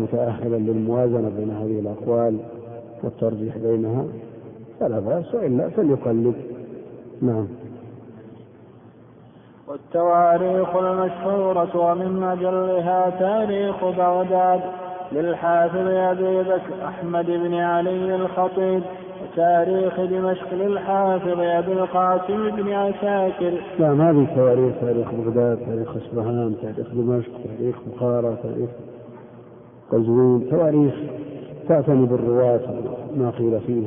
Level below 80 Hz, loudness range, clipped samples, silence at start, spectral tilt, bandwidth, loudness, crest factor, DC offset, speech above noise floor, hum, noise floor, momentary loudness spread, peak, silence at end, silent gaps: -60 dBFS; 6 LU; under 0.1%; 0 s; -12.5 dB/octave; 3.7 kHz; -21 LUFS; 16 dB; under 0.1%; 26 dB; none; -47 dBFS; 14 LU; -6 dBFS; 0 s; none